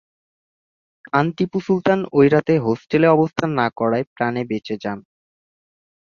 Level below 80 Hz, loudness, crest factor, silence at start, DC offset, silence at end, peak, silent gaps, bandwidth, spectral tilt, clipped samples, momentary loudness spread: -58 dBFS; -19 LUFS; 18 dB; 1.15 s; under 0.1%; 1 s; -2 dBFS; 4.07-4.16 s; 7.2 kHz; -8 dB/octave; under 0.1%; 10 LU